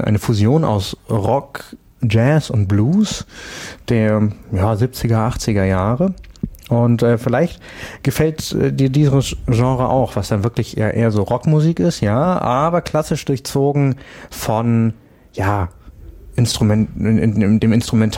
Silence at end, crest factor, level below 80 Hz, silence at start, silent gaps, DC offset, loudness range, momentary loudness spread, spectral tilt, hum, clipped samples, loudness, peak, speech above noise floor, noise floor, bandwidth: 0 s; 14 dB; -38 dBFS; 0 s; none; under 0.1%; 2 LU; 12 LU; -7 dB/octave; none; under 0.1%; -17 LUFS; -4 dBFS; 22 dB; -38 dBFS; 16.5 kHz